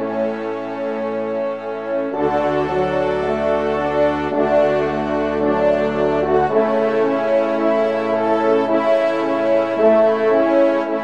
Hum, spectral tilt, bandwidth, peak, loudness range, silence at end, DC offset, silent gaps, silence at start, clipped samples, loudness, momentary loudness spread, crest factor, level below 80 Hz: none; -7 dB/octave; 8.4 kHz; -2 dBFS; 4 LU; 0 s; 0.4%; none; 0 s; under 0.1%; -18 LUFS; 7 LU; 14 dB; -46 dBFS